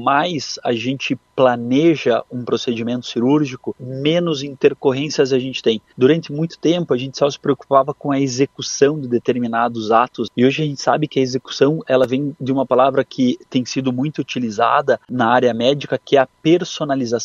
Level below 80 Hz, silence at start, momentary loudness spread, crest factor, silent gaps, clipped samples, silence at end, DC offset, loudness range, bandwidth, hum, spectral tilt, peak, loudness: -62 dBFS; 0 s; 7 LU; 18 dB; none; under 0.1%; 0 s; under 0.1%; 1 LU; 7.6 kHz; none; -5.5 dB/octave; 0 dBFS; -18 LUFS